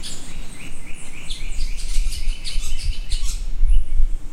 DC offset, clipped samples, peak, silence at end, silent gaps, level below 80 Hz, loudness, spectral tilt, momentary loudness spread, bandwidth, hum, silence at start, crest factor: under 0.1%; under 0.1%; -2 dBFS; 0 s; none; -20 dBFS; -29 LUFS; -3 dB/octave; 13 LU; 11 kHz; none; 0 s; 14 dB